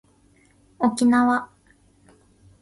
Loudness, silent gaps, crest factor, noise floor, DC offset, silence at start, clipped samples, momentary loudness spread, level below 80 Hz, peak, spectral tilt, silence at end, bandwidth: -21 LUFS; none; 18 dB; -58 dBFS; under 0.1%; 0.8 s; under 0.1%; 10 LU; -62 dBFS; -6 dBFS; -4.5 dB/octave; 1.15 s; 11.5 kHz